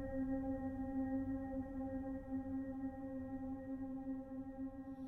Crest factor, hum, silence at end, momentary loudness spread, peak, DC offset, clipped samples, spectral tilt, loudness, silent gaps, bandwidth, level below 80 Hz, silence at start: 12 dB; none; 0 s; 6 LU; -32 dBFS; under 0.1%; under 0.1%; -10.5 dB/octave; -45 LUFS; none; 2.6 kHz; -58 dBFS; 0 s